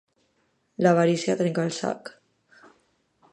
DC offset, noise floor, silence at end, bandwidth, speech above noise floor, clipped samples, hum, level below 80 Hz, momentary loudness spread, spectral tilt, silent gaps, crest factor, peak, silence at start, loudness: under 0.1%; -70 dBFS; 1.2 s; 11 kHz; 47 dB; under 0.1%; none; -74 dBFS; 19 LU; -6 dB/octave; none; 22 dB; -6 dBFS; 0.8 s; -24 LUFS